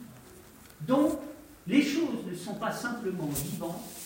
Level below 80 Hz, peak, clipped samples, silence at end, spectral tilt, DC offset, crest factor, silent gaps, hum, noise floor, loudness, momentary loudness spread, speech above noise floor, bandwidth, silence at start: -60 dBFS; -12 dBFS; under 0.1%; 0 s; -5 dB/octave; under 0.1%; 20 dB; none; none; -52 dBFS; -31 LUFS; 21 LU; 22 dB; 16.5 kHz; 0 s